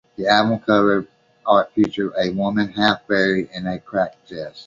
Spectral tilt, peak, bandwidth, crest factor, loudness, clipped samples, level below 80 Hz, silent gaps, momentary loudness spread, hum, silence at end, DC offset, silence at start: -6 dB/octave; -2 dBFS; 7.4 kHz; 18 dB; -19 LUFS; under 0.1%; -54 dBFS; none; 10 LU; none; 0.05 s; under 0.1%; 0.2 s